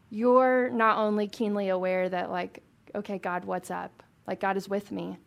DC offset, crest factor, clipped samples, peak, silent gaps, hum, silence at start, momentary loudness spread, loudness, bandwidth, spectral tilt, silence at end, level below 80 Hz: under 0.1%; 20 dB; under 0.1%; -8 dBFS; none; none; 0.1 s; 16 LU; -28 LUFS; 14.5 kHz; -6.5 dB/octave; 0.1 s; -74 dBFS